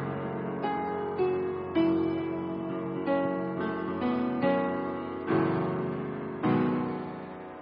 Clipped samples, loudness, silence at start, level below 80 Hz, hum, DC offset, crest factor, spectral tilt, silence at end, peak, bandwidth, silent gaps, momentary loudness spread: under 0.1%; -30 LUFS; 0 s; -64 dBFS; none; under 0.1%; 14 dB; -11.5 dB/octave; 0 s; -14 dBFS; 5.4 kHz; none; 7 LU